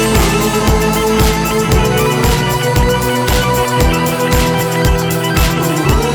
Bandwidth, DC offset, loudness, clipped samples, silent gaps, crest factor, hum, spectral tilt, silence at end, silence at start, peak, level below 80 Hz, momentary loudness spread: over 20 kHz; under 0.1%; -13 LUFS; under 0.1%; none; 12 dB; none; -4.5 dB/octave; 0 s; 0 s; 0 dBFS; -20 dBFS; 2 LU